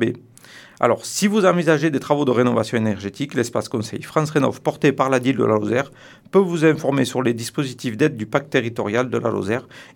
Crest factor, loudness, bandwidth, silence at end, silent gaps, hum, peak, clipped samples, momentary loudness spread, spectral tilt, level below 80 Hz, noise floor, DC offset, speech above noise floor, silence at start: 20 dB; -20 LUFS; 18 kHz; 0.1 s; none; none; 0 dBFS; under 0.1%; 8 LU; -5.5 dB/octave; -64 dBFS; -45 dBFS; under 0.1%; 25 dB; 0 s